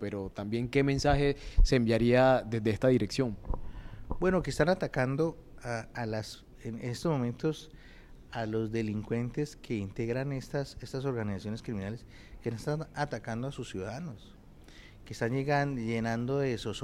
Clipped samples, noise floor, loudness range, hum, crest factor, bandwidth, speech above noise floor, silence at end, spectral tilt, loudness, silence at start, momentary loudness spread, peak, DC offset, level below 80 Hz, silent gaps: under 0.1%; -52 dBFS; 9 LU; none; 18 dB; 13 kHz; 22 dB; 0 s; -6.5 dB/octave; -32 LUFS; 0 s; 15 LU; -12 dBFS; under 0.1%; -40 dBFS; none